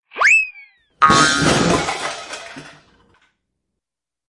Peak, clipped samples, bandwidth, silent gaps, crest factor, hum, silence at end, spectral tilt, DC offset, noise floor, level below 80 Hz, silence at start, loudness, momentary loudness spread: 0 dBFS; under 0.1%; 11.5 kHz; none; 20 dB; none; 1.6 s; -3 dB/octave; under 0.1%; -86 dBFS; -44 dBFS; 0.15 s; -15 LUFS; 19 LU